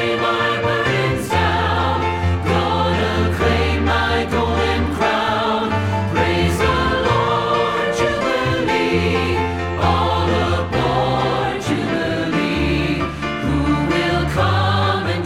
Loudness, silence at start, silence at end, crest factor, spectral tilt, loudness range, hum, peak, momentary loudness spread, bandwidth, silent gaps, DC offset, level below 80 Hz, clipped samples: -18 LUFS; 0 s; 0 s; 14 dB; -6 dB/octave; 1 LU; none; -4 dBFS; 3 LU; 14.5 kHz; none; under 0.1%; -32 dBFS; under 0.1%